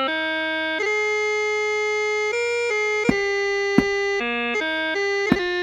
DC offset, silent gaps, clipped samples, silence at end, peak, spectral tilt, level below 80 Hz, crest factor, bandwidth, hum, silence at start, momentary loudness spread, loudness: under 0.1%; none; under 0.1%; 0 s; -2 dBFS; -4 dB/octave; -50 dBFS; 22 dB; 9.8 kHz; none; 0 s; 3 LU; -21 LUFS